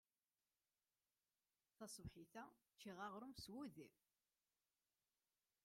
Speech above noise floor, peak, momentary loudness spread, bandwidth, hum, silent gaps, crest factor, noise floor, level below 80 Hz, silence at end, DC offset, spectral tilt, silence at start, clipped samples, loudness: over 32 dB; -40 dBFS; 10 LU; 16 kHz; none; none; 22 dB; under -90 dBFS; -80 dBFS; 1.75 s; under 0.1%; -4 dB/octave; 1.8 s; under 0.1%; -58 LUFS